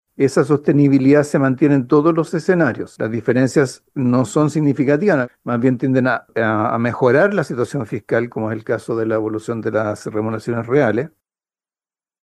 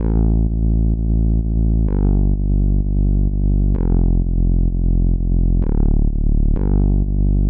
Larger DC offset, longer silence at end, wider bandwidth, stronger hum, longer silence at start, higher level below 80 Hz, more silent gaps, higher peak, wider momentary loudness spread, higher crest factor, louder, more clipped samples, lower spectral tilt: neither; first, 1.15 s vs 0 s; first, 12 kHz vs 1.6 kHz; neither; first, 0.2 s vs 0 s; second, -58 dBFS vs -16 dBFS; neither; first, -2 dBFS vs -6 dBFS; first, 9 LU vs 2 LU; first, 16 dB vs 8 dB; about the same, -17 LUFS vs -19 LUFS; neither; second, -7.5 dB/octave vs -15.5 dB/octave